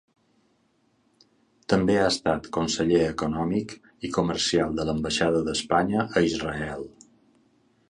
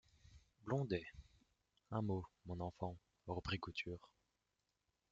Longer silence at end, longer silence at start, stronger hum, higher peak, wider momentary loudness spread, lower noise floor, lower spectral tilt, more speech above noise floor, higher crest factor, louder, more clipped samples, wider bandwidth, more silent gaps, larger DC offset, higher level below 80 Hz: about the same, 1 s vs 1.05 s; first, 1.7 s vs 0.3 s; neither; first, -6 dBFS vs -28 dBFS; second, 11 LU vs 15 LU; second, -67 dBFS vs -88 dBFS; about the same, -4.5 dB/octave vs -5.5 dB/octave; about the same, 43 dB vs 43 dB; about the same, 20 dB vs 20 dB; first, -25 LUFS vs -46 LUFS; neither; first, 11 kHz vs 7.8 kHz; neither; neither; first, -50 dBFS vs -68 dBFS